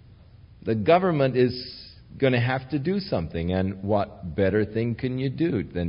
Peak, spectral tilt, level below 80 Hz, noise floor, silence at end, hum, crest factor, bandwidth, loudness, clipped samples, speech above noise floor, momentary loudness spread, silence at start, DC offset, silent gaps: -6 dBFS; -11.5 dB/octave; -50 dBFS; -50 dBFS; 0 s; none; 18 dB; 5.4 kHz; -25 LUFS; under 0.1%; 26 dB; 10 LU; 0.5 s; under 0.1%; none